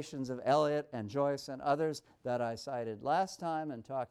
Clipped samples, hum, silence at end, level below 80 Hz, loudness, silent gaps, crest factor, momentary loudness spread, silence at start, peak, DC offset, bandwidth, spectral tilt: under 0.1%; none; 0.05 s; -74 dBFS; -35 LUFS; none; 18 dB; 9 LU; 0 s; -18 dBFS; under 0.1%; 13.5 kHz; -5.5 dB/octave